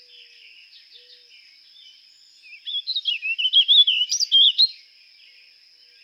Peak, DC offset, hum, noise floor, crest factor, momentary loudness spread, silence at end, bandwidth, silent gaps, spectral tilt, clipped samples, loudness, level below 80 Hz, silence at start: -6 dBFS; under 0.1%; none; -53 dBFS; 18 dB; 14 LU; 1.3 s; 16.5 kHz; none; 8.5 dB/octave; under 0.1%; -16 LUFS; under -90 dBFS; 2.5 s